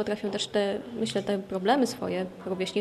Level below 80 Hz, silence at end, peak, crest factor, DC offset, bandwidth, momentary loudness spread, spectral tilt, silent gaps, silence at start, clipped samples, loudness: -64 dBFS; 0 s; -12 dBFS; 16 dB; under 0.1%; 14 kHz; 7 LU; -4.5 dB/octave; none; 0 s; under 0.1%; -29 LUFS